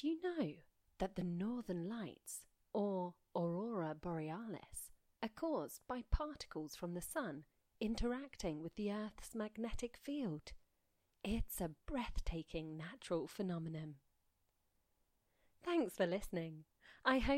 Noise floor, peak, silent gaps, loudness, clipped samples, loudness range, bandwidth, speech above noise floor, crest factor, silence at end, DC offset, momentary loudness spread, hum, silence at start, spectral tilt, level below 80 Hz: -82 dBFS; -22 dBFS; none; -44 LUFS; under 0.1%; 3 LU; 16.5 kHz; 39 dB; 22 dB; 0 s; under 0.1%; 10 LU; none; 0 s; -5.5 dB/octave; -54 dBFS